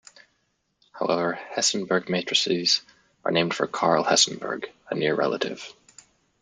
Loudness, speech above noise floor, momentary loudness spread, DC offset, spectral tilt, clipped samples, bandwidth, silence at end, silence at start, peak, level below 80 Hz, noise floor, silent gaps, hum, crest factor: -24 LUFS; 48 dB; 12 LU; under 0.1%; -2.5 dB/octave; under 0.1%; 12 kHz; 0.7 s; 0.95 s; -6 dBFS; -70 dBFS; -72 dBFS; none; none; 20 dB